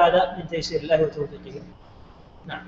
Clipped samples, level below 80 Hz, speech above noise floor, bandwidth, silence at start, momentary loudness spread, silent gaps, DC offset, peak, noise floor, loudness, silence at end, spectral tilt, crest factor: under 0.1%; -48 dBFS; 23 dB; 7.8 kHz; 0 s; 19 LU; none; under 0.1%; -6 dBFS; -47 dBFS; -24 LUFS; 0 s; -5 dB/octave; 20 dB